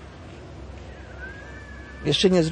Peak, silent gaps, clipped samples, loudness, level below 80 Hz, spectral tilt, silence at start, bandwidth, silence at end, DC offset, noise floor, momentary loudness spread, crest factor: -6 dBFS; none; under 0.1%; -21 LUFS; -44 dBFS; -5 dB/octave; 0 s; 10 kHz; 0 s; under 0.1%; -41 dBFS; 22 LU; 20 dB